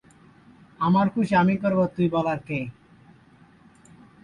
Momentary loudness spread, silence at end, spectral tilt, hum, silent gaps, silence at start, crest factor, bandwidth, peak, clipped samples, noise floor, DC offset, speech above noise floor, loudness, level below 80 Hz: 10 LU; 1.5 s; -8.5 dB/octave; none; none; 0.8 s; 16 dB; 9.8 kHz; -10 dBFS; under 0.1%; -54 dBFS; under 0.1%; 32 dB; -23 LUFS; -58 dBFS